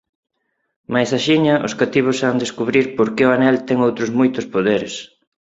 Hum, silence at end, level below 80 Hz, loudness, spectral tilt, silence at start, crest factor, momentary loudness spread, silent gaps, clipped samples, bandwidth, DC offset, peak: none; 0.35 s; -58 dBFS; -17 LUFS; -5.5 dB/octave; 0.9 s; 16 dB; 6 LU; none; under 0.1%; 8 kHz; under 0.1%; -2 dBFS